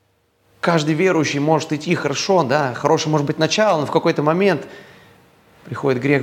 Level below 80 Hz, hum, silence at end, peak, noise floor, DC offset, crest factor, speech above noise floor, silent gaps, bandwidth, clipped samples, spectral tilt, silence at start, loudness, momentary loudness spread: -64 dBFS; none; 0 s; 0 dBFS; -61 dBFS; under 0.1%; 18 dB; 44 dB; none; 16.5 kHz; under 0.1%; -5 dB/octave; 0.65 s; -18 LUFS; 5 LU